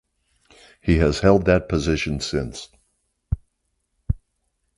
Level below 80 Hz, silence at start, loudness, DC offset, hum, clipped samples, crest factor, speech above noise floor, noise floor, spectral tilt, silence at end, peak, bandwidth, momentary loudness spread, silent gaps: -34 dBFS; 0.85 s; -22 LUFS; under 0.1%; none; under 0.1%; 22 dB; 54 dB; -73 dBFS; -6 dB/octave; 0.6 s; -2 dBFS; 11.5 kHz; 14 LU; none